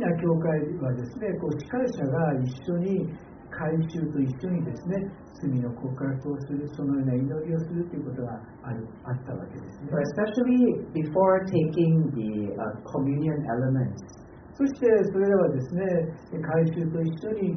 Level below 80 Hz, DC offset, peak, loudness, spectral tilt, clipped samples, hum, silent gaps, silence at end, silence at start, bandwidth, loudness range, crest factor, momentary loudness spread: -58 dBFS; under 0.1%; -8 dBFS; -27 LUFS; -9 dB/octave; under 0.1%; none; none; 0 s; 0 s; 6.4 kHz; 6 LU; 18 dB; 13 LU